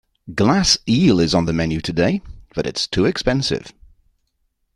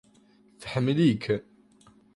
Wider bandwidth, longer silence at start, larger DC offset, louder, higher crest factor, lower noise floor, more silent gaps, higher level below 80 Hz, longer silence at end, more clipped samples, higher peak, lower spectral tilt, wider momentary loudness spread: about the same, 12 kHz vs 11.5 kHz; second, 0.25 s vs 0.6 s; neither; first, -18 LUFS vs -26 LUFS; about the same, 18 dB vs 18 dB; first, -69 dBFS vs -60 dBFS; neither; first, -40 dBFS vs -60 dBFS; first, 1.05 s vs 0.75 s; neither; first, 0 dBFS vs -12 dBFS; second, -5 dB/octave vs -7.5 dB/octave; about the same, 12 LU vs 11 LU